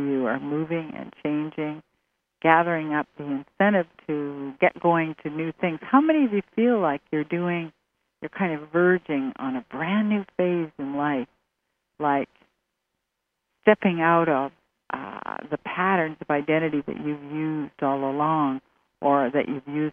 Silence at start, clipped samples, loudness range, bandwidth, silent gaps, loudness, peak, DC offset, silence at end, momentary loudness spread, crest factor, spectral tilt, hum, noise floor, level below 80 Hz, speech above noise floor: 0 s; under 0.1%; 4 LU; 3.7 kHz; none; -25 LUFS; -2 dBFS; under 0.1%; 0 s; 12 LU; 24 dB; -9.5 dB/octave; none; -80 dBFS; -68 dBFS; 56 dB